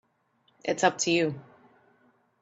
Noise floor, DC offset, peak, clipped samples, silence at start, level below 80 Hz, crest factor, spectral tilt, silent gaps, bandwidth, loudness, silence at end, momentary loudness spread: -70 dBFS; under 0.1%; -8 dBFS; under 0.1%; 0.65 s; -74 dBFS; 22 dB; -3.5 dB/octave; none; 8.2 kHz; -27 LUFS; 1 s; 13 LU